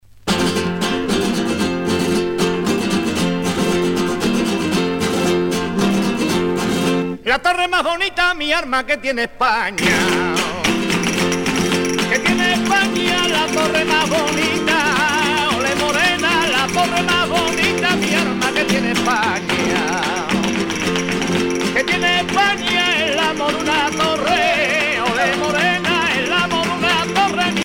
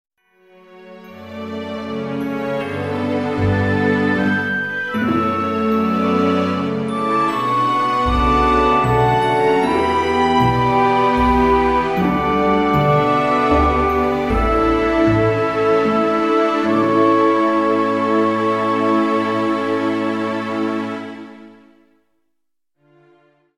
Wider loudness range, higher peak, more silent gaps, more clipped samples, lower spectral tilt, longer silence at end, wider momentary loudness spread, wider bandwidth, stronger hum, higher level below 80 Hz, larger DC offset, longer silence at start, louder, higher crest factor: second, 3 LU vs 7 LU; about the same, -4 dBFS vs -2 dBFS; neither; neither; second, -3.5 dB/octave vs -7 dB/octave; second, 0 s vs 2.1 s; second, 4 LU vs 8 LU; first, 17.5 kHz vs 15 kHz; neither; second, -44 dBFS vs -34 dBFS; second, under 0.1% vs 0.2%; second, 0.15 s vs 0.7 s; about the same, -17 LUFS vs -17 LUFS; about the same, 14 dB vs 16 dB